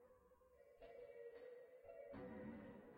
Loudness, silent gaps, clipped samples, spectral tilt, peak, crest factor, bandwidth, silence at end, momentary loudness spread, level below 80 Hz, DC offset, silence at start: -59 LUFS; none; under 0.1%; -8 dB/octave; -44 dBFS; 14 dB; 16 kHz; 0 s; 7 LU; -78 dBFS; under 0.1%; 0 s